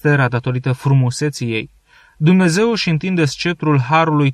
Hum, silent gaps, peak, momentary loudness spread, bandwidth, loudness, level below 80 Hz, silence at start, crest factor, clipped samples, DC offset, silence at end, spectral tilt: none; none; -2 dBFS; 8 LU; 12.5 kHz; -16 LUFS; -52 dBFS; 0.05 s; 14 dB; under 0.1%; under 0.1%; 0 s; -6 dB/octave